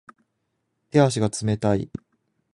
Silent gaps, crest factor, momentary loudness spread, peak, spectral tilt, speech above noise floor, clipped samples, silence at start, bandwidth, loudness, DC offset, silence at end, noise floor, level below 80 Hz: none; 20 dB; 14 LU; -4 dBFS; -6 dB/octave; 54 dB; under 0.1%; 0.95 s; 11.5 kHz; -22 LUFS; under 0.1%; 0.65 s; -75 dBFS; -52 dBFS